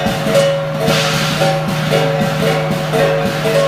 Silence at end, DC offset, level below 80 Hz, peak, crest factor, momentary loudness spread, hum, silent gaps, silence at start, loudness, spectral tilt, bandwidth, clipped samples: 0 s; under 0.1%; -42 dBFS; 0 dBFS; 14 dB; 3 LU; none; none; 0 s; -15 LUFS; -5 dB/octave; 15.5 kHz; under 0.1%